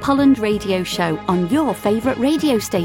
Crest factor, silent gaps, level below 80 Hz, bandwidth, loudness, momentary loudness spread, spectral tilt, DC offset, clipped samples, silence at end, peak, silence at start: 12 dB; none; -44 dBFS; 17 kHz; -18 LUFS; 5 LU; -5.5 dB/octave; under 0.1%; under 0.1%; 0 s; -4 dBFS; 0 s